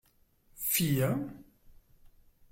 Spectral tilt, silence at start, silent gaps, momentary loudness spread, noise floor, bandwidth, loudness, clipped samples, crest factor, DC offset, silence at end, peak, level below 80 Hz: -4.5 dB/octave; 0.55 s; none; 10 LU; -67 dBFS; 17 kHz; -30 LUFS; under 0.1%; 18 dB; under 0.1%; 1.1 s; -18 dBFS; -60 dBFS